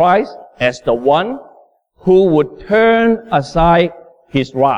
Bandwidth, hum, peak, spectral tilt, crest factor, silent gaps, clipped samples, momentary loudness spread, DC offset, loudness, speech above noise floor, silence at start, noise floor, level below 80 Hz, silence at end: 9.6 kHz; none; -2 dBFS; -7 dB/octave; 12 dB; none; under 0.1%; 10 LU; under 0.1%; -14 LUFS; 36 dB; 0 s; -48 dBFS; -36 dBFS; 0 s